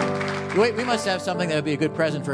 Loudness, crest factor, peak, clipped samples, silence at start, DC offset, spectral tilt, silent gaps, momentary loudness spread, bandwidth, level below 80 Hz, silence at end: -23 LUFS; 16 dB; -8 dBFS; under 0.1%; 0 s; under 0.1%; -5 dB/octave; none; 4 LU; 11 kHz; -62 dBFS; 0 s